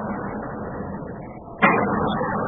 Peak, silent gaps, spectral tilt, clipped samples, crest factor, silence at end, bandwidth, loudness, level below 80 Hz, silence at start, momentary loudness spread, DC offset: -2 dBFS; none; -11 dB/octave; under 0.1%; 22 dB; 0 s; 3.8 kHz; -23 LUFS; -46 dBFS; 0 s; 17 LU; under 0.1%